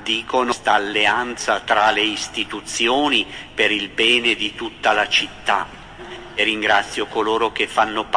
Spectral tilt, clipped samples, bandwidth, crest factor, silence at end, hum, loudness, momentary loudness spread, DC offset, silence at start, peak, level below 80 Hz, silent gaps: -2 dB/octave; under 0.1%; 10.5 kHz; 18 dB; 0 s; none; -18 LUFS; 9 LU; under 0.1%; 0 s; -2 dBFS; -50 dBFS; none